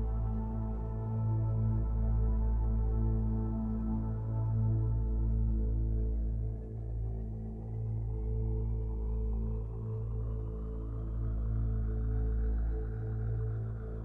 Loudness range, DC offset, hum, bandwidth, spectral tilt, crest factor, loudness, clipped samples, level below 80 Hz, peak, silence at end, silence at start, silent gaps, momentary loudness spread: 4 LU; under 0.1%; none; 1.9 kHz; -12.5 dB/octave; 10 dB; -35 LUFS; under 0.1%; -34 dBFS; -22 dBFS; 0 s; 0 s; none; 7 LU